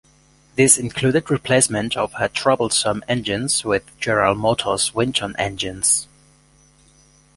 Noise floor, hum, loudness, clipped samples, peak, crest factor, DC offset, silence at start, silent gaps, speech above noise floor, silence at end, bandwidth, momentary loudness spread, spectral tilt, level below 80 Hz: -54 dBFS; none; -19 LUFS; under 0.1%; 0 dBFS; 20 dB; under 0.1%; 0.55 s; none; 35 dB; 1.3 s; 12 kHz; 8 LU; -3 dB/octave; -50 dBFS